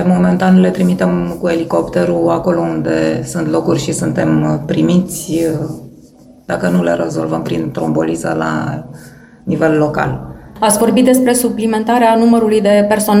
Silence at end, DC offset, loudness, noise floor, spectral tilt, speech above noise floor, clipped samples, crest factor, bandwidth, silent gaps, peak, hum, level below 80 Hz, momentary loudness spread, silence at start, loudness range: 0 s; under 0.1%; -14 LUFS; -41 dBFS; -6 dB/octave; 28 dB; under 0.1%; 14 dB; 16.5 kHz; none; 0 dBFS; none; -42 dBFS; 9 LU; 0 s; 5 LU